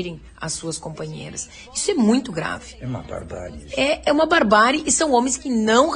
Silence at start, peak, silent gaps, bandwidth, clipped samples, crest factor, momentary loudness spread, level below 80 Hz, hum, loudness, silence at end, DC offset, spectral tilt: 0 s; -2 dBFS; none; 10 kHz; under 0.1%; 18 dB; 17 LU; -46 dBFS; none; -19 LUFS; 0 s; under 0.1%; -3.5 dB/octave